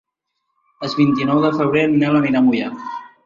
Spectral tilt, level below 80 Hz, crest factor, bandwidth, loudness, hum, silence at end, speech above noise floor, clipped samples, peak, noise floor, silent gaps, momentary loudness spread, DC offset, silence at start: -7.5 dB/octave; -58 dBFS; 14 dB; 7.4 kHz; -17 LUFS; none; 0.2 s; 58 dB; under 0.1%; -4 dBFS; -75 dBFS; none; 13 LU; under 0.1%; 0.8 s